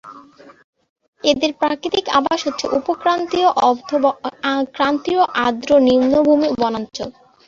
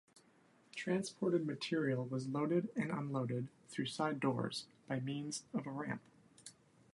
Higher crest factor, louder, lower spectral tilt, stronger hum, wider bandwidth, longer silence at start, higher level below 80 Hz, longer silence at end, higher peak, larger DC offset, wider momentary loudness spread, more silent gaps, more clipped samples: about the same, 16 dB vs 18 dB; first, -17 LUFS vs -40 LUFS; second, -4 dB/octave vs -5.5 dB/octave; neither; second, 7.6 kHz vs 11.5 kHz; second, 0.05 s vs 0.75 s; first, -54 dBFS vs -82 dBFS; about the same, 0.35 s vs 0.4 s; first, -2 dBFS vs -22 dBFS; neither; second, 7 LU vs 10 LU; first, 0.64-0.73 s, 0.89-0.96 s, 1.08-1.13 s vs none; neither